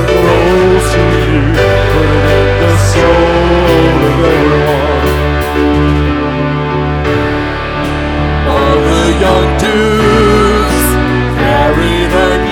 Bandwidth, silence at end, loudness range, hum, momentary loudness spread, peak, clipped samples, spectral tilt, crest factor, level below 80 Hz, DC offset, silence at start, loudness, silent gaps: over 20 kHz; 0 s; 3 LU; none; 5 LU; 0 dBFS; under 0.1%; -6 dB/octave; 10 dB; -18 dBFS; under 0.1%; 0 s; -10 LUFS; none